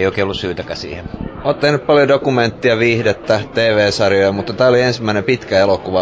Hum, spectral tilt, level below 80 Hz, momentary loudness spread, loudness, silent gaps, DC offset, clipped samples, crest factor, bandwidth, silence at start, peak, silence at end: none; -5.5 dB/octave; -40 dBFS; 11 LU; -15 LUFS; none; under 0.1%; under 0.1%; 14 dB; 8 kHz; 0 s; -2 dBFS; 0 s